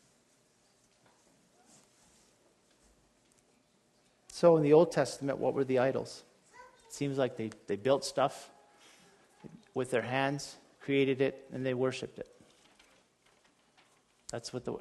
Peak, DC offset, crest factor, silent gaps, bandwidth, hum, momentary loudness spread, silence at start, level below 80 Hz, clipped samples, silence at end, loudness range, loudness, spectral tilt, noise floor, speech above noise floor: -12 dBFS; under 0.1%; 22 dB; none; 12.5 kHz; none; 22 LU; 4.3 s; -74 dBFS; under 0.1%; 0 s; 6 LU; -31 LUFS; -5.5 dB/octave; -70 dBFS; 39 dB